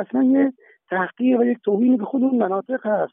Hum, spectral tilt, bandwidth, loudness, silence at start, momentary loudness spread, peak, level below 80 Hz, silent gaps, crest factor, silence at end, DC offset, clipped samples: none; -12 dB/octave; 3.6 kHz; -20 LUFS; 0 s; 7 LU; -8 dBFS; -82 dBFS; none; 12 dB; 0.05 s; under 0.1%; under 0.1%